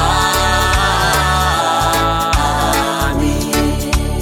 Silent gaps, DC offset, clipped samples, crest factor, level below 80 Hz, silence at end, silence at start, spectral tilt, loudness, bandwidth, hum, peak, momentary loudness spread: none; under 0.1%; under 0.1%; 12 dB; -22 dBFS; 0 s; 0 s; -4 dB/octave; -14 LUFS; 17 kHz; none; -2 dBFS; 3 LU